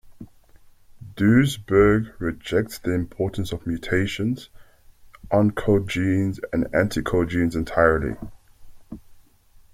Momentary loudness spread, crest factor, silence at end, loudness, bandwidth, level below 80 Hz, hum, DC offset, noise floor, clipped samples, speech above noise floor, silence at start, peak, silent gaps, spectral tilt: 14 LU; 20 dB; 0.55 s; -22 LUFS; 16 kHz; -42 dBFS; none; under 0.1%; -53 dBFS; under 0.1%; 31 dB; 0.05 s; -4 dBFS; none; -7 dB/octave